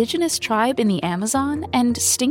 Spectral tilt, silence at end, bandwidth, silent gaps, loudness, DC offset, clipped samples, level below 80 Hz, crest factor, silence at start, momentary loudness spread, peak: -3.5 dB/octave; 0 s; 17 kHz; none; -20 LUFS; under 0.1%; under 0.1%; -50 dBFS; 14 dB; 0 s; 4 LU; -6 dBFS